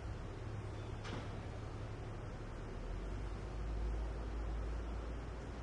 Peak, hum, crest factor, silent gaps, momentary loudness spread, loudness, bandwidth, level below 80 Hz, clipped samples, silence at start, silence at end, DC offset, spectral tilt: -32 dBFS; none; 12 dB; none; 4 LU; -46 LUFS; 10.5 kHz; -46 dBFS; under 0.1%; 0 s; 0 s; under 0.1%; -6.5 dB/octave